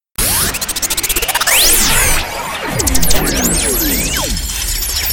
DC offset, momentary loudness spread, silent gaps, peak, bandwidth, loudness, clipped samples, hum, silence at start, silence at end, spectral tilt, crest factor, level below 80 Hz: under 0.1%; 9 LU; none; 0 dBFS; 19.5 kHz; -13 LUFS; under 0.1%; none; 0 s; 0 s; -1.5 dB/octave; 14 dB; -22 dBFS